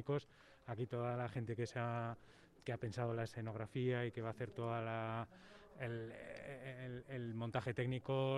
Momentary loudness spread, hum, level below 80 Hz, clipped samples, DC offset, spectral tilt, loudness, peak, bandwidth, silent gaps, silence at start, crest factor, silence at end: 11 LU; none; -72 dBFS; under 0.1%; under 0.1%; -7.5 dB/octave; -44 LUFS; -26 dBFS; 11 kHz; none; 0 s; 18 dB; 0 s